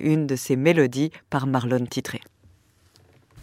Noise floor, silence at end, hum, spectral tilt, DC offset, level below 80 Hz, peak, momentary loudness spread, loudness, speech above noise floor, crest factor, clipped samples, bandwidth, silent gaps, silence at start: -58 dBFS; 0 s; none; -6 dB/octave; under 0.1%; -64 dBFS; -6 dBFS; 11 LU; -23 LUFS; 36 dB; 18 dB; under 0.1%; 16 kHz; none; 0 s